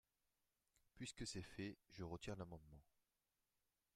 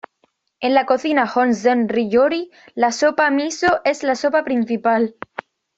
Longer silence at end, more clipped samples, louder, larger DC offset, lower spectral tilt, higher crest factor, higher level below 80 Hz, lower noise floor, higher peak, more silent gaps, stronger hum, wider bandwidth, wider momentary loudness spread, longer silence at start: first, 1.15 s vs 0.65 s; neither; second, -54 LUFS vs -18 LUFS; neither; about the same, -4.5 dB/octave vs -4 dB/octave; about the same, 20 dB vs 16 dB; second, -72 dBFS vs -62 dBFS; first, under -90 dBFS vs -65 dBFS; second, -36 dBFS vs -2 dBFS; neither; neither; first, 14.5 kHz vs 8 kHz; about the same, 7 LU vs 8 LU; first, 0.95 s vs 0.6 s